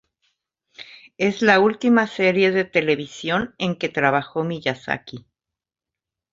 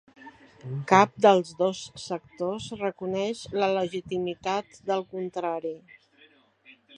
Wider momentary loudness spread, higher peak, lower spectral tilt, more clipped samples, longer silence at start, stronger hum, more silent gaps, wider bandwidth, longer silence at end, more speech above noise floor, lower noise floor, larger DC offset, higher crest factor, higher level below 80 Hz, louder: second, 12 LU vs 15 LU; about the same, -2 dBFS vs -2 dBFS; about the same, -5.5 dB/octave vs -5 dB/octave; neither; first, 0.8 s vs 0.2 s; neither; neither; second, 7.8 kHz vs 10.5 kHz; about the same, 1.15 s vs 1.2 s; first, 68 dB vs 33 dB; first, -88 dBFS vs -60 dBFS; neither; second, 20 dB vs 26 dB; first, -60 dBFS vs -66 dBFS; first, -20 LUFS vs -27 LUFS